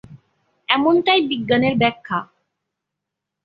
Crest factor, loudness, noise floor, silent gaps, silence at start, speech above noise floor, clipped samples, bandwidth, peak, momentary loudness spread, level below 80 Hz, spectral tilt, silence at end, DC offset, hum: 18 dB; -18 LUFS; -82 dBFS; none; 0.1 s; 64 dB; under 0.1%; 5.2 kHz; -2 dBFS; 11 LU; -58 dBFS; -8 dB/octave; 1.2 s; under 0.1%; none